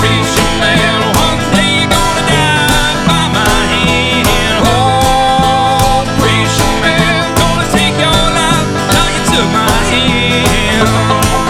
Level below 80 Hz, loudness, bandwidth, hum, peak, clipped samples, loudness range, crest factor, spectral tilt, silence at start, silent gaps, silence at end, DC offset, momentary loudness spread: -22 dBFS; -10 LUFS; 18 kHz; none; 0 dBFS; under 0.1%; 1 LU; 10 dB; -4 dB/octave; 0 s; none; 0 s; under 0.1%; 1 LU